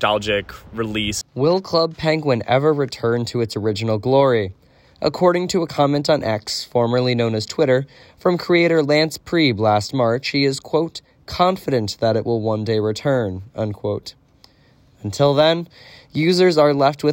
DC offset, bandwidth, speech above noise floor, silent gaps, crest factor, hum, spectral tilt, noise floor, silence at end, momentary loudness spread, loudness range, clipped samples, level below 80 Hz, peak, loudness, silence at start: under 0.1%; 16.5 kHz; 35 dB; none; 16 dB; none; -5.5 dB/octave; -53 dBFS; 0 s; 11 LU; 4 LU; under 0.1%; -52 dBFS; -4 dBFS; -19 LUFS; 0 s